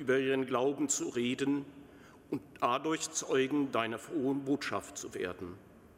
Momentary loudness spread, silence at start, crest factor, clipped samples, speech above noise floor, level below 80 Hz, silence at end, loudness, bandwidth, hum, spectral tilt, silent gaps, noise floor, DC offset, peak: 11 LU; 0 s; 18 dB; under 0.1%; 22 dB; -70 dBFS; 0.1 s; -34 LUFS; 16 kHz; none; -3.5 dB/octave; none; -56 dBFS; under 0.1%; -16 dBFS